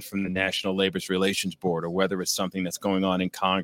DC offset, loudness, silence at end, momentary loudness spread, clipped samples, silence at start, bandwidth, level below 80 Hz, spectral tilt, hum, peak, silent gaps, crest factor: under 0.1%; -26 LUFS; 0 s; 4 LU; under 0.1%; 0 s; 17 kHz; -62 dBFS; -4 dB/octave; none; -8 dBFS; none; 18 dB